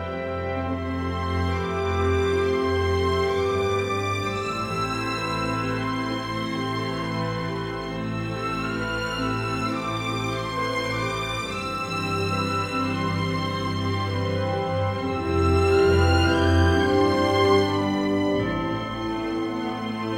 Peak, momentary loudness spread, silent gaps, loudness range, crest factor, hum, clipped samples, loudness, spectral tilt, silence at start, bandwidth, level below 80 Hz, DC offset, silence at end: -8 dBFS; 8 LU; none; 7 LU; 16 dB; none; under 0.1%; -24 LUFS; -6 dB/octave; 0 s; 15.5 kHz; -40 dBFS; under 0.1%; 0 s